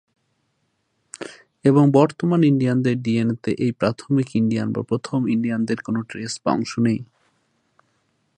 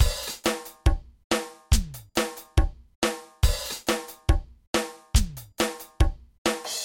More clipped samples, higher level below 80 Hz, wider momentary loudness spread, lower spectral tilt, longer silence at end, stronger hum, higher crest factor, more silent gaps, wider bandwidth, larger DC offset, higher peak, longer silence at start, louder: neither; second, -60 dBFS vs -28 dBFS; first, 11 LU vs 3 LU; first, -7 dB/octave vs -4 dB/octave; first, 1.35 s vs 0 s; neither; about the same, 20 dB vs 20 dB; second, none vs 1.24-1.30 s, 2.95-3.02 s, 4.67-4.73 s, 6.38-6.45 s; second, 9.6 kHz vs 17 kHz; neither; first, -2 dBFS vs -6 dBFS; first, 1.2 s vs 0 s; first, -21 LUFS vs -28 LUFS